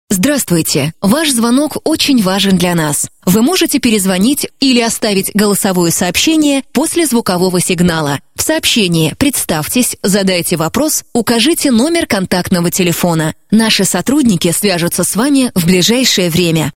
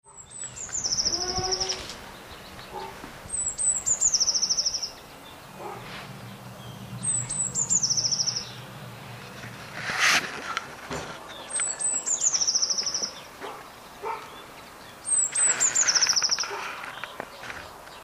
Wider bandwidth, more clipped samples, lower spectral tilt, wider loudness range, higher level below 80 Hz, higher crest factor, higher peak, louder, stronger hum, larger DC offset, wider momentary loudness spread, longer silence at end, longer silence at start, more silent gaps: about the same, 17 kHz vs 16 kHz; neither; first, -4 dB/octave vs 0 dB/octave; second, 1 LU vs 5 LU; first, -42 dBFS vs -56 dBFS; second, 12 dB vs 22 dB; first, 0 dBFS vs -8 dBFS; first, -11 LUFS vs -24 LUFS; neither; neither; second, 4 LU vs 22 LU; about the same, 0.05 s vs 0 s; about the same, 0.1 s vs 0.05 s; neither